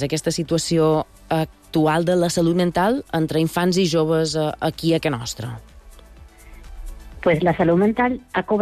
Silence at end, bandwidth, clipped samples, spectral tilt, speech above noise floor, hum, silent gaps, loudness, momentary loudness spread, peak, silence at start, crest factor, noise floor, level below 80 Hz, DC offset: 0 s; 14.5 kHz; under 0.1%; -5.5 dB/octave; 25 dB; none; none; -20 LUFS; 10 LU; -6 dBFS; 0 s; 14 dB; -44 dBFS; -44 dBFS; under 0.1%